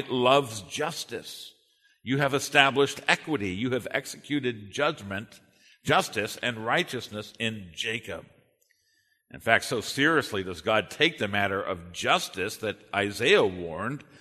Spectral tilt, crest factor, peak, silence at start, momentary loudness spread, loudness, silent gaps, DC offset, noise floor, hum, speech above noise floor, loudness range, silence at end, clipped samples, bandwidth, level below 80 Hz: -4 dB/octave; 26 dB; -2 dBFS; 0 s; 14 LU; -27 LUFS; none; under 0.1%; -70 dBFS; none; 43 dB; 4 LU; 0.05 s; under 0.1%; 13.5 kHz; -64 dBFS